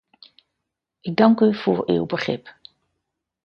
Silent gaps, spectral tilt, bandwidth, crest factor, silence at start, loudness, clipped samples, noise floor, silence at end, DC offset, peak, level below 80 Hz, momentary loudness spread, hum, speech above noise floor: none; -7.5 dB/octave; 6.6 kHz; 22 dB; 1.05 s; -20 LUFS; under 0.1%; -81 dBFS; 0.95 s; under 0.1%; 0 dBFS; -62 dBFS; 13 LU; none; 62 dB